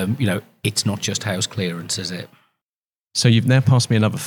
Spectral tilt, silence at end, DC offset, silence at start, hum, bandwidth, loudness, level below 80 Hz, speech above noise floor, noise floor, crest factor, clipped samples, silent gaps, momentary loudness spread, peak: -5 dB/octave; 0 s; under 0.1%; 0 s; none; 18.5 kHz; -20 LUFS; -64 dBFS; over 71 dB; under -90 dBFS; 18 dB; under 0.1%; 2.62-2.88 s, 3.00-3.07 s; 10 LU; -2 dBFS